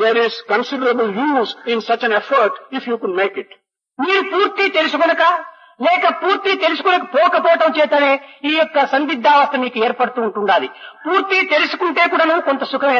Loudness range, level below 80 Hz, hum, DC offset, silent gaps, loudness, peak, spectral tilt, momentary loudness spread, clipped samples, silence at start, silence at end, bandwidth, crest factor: 4 LU; -80 dBFS; none; under 0.1%; none; -16 LUFS; -2 dBFS; -4.5 dB/octave; 7 LU; under 0.1%; 0 s; 0 s; 7.2 kHz; 14 dB